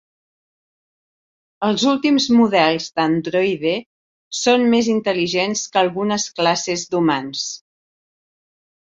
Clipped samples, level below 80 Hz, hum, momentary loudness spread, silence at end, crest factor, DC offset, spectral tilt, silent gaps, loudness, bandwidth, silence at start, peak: under 0.1%; -62 dBFS; none; 9 LU; 1.25 s; 18 dB; under 0.1%; -4 dB/octave; 3.86-4.31 s; -18 LUFS; 7.8 kHz; 1.6 s; -2 dBFS